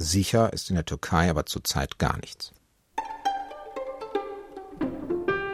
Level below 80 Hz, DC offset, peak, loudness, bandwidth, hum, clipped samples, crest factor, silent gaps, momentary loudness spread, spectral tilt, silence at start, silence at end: -42 dBFS; under 0.1%; -6 dBFS; -28 LUFS; 16 kHz; none; under 0.1%; 22 dB; none; 15 LU; -4.5 dB/octave; 0 s; 0 s